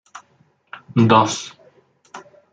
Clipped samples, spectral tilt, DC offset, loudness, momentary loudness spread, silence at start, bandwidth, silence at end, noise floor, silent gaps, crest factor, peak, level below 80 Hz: under 0.1%; -5.5 dB/octave; under 0.1%; -17 LUFS; 27 LU; 0.15 s; 9.2 kHz; 0.35 s; -59 dBFS; none; 20 dB; -2 dBFS; -62 dBFS